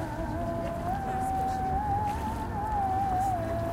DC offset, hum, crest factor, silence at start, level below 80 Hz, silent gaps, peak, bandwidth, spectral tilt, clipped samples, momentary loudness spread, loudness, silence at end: under 0.1%; none; 12 dB; 0 s; -40 dBFS; none; -18 dBFS; 16.5 kHz; -7 dB/octave; under 0.1%; 5 LU; -30 LUFS; 0 s